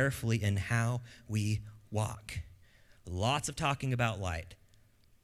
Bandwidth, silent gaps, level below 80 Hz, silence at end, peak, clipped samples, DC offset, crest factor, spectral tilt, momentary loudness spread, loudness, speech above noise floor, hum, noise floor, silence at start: 14.5 kHz; none; -54 dBFS; 0.7 s; -14 dBFS; under 0.1%; under 0.1%; 20 dB; -5 dB/octave; 12 LU; -34 LUFS; 31 dB; none; -64 dBFS; 0 s